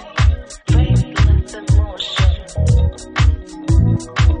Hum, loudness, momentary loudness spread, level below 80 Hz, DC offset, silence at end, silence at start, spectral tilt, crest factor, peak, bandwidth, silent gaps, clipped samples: none; -17 LUFS; 5 LU; -18 dBFS; under 0.1%; 0 s; 0 s; -6 dB/octave; 12 dB; -2 dBFS; 10 kHz; none; under 0.1%